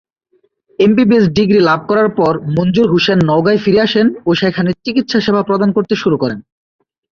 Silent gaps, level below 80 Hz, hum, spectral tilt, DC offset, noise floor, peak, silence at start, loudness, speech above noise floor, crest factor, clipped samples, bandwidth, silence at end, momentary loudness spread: none; -48 dBFS; none; -7 dB/octave; under 0.1%; -59 dBFS; -2 dBFS; 0.8 s; -13 LUFS; 47 dB; 12 dB; under 0.1%; 7 kHz; 0.7 s; 5 LU